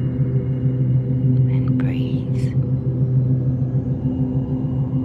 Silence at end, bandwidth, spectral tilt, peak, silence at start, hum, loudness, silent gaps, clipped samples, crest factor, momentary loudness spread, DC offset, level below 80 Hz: 0 s; 3.3 kHz; -11 dB/octave; -8 dBFS; 0 s; none; -20 LUFS; none; under 0.1%; 12 dB; 4 LU; under 0.1%; -38 dBFS